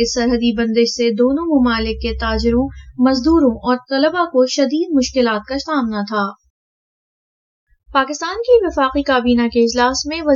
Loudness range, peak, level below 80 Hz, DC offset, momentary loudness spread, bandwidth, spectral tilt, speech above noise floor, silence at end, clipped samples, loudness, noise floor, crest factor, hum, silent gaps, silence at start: 5 LU; -2 dBFS; -34 dBFS; under 0.1%; 6 LU; 7.6 kHz; -4.5 dB/octave; over 74 dB; 0 s; under 0.1%; -16 LUFS; under -90 dBFS; 14 dB; none; 6.50-7.67 s; 0 s